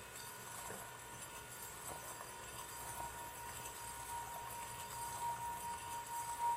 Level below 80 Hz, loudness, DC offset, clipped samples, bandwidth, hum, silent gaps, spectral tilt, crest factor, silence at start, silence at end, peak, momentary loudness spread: -66 dBFS; -46 LUFS; under 0.1%; under 0.1%; 16 kHz; none; none; -2 dB/octave; 16 dB; 0 s; 0 s; -30 dBFS; 6 LU